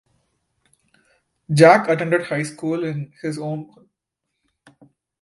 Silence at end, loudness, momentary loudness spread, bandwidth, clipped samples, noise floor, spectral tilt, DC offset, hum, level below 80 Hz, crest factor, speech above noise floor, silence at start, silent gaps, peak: 1.55 s; -19 LUFS; 16 LU; 11.5 kHz; under 0.1%; -79 dBFS; -6 dB/octave; under 0.1%; none; -66 dBFS; 22 dB; 61 dB; 1.5 s; none; 0 dBFS